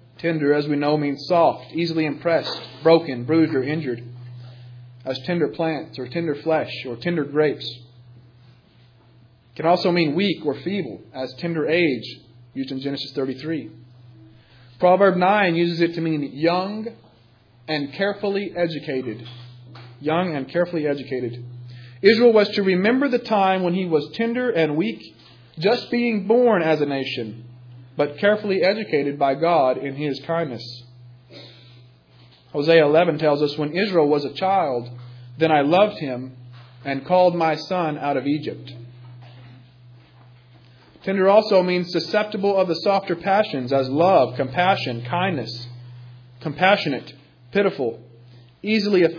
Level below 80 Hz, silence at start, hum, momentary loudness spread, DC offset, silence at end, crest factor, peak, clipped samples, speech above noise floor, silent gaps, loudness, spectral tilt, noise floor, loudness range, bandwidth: -66 dBFS; 0.2 s; none; 17 LU; under 0.1%; 0 s; 20 dB; -2 dBFS; under 0.1%; 33 dB; none; -21 LUFS; -7.5 dB/octave; -54 dBFS; 6 LU; 5.4 kHz